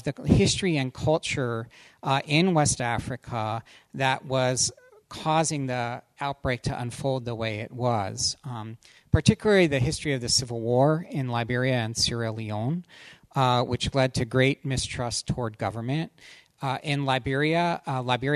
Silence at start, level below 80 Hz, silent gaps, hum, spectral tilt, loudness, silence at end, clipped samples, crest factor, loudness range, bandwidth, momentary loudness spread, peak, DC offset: 0.05 s; -46 dBFS; none; none; -4.5 dB/octave; -26 LUFS; 0 s; under 0.1%; 22 dB; 4 LU; 13 kHz; 11 LU; -4 dBFS; under 0.1%